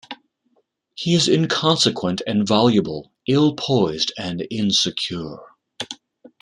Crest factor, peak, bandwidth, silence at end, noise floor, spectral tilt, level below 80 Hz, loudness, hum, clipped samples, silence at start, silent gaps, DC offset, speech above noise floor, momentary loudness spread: 18 dB; -2 dBFS; 11.5 kHz; 0.45 s; -66 dBFS; -4.5 dB/octave; -58 dBFS; -19 LUFS; none; under 0.1%; 0.1 s; none; under 0.1%; 47 dB; 16 LU